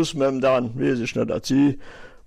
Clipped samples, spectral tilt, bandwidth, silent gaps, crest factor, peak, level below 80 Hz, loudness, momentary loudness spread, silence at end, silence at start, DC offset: under 0.1%; -6 dB/octave; 13.5 kHz; none; 12 dB; -10 dBFS; -48 dBFS; -22 LUFS; 5 LU; 0.1 s; 0 s; under 0.1%